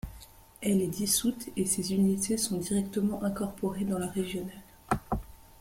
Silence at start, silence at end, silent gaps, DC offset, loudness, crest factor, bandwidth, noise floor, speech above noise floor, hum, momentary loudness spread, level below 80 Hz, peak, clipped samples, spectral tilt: 0.05 s; 0.2 s; none; under 0.1%; -30 LUFS; 20 dB; 16.5 kHz; -52 dBFS; 22 dB; none; 9 LU; -50 dBFS; -12 dBFS; under 0.1%; -4.5 dB/octave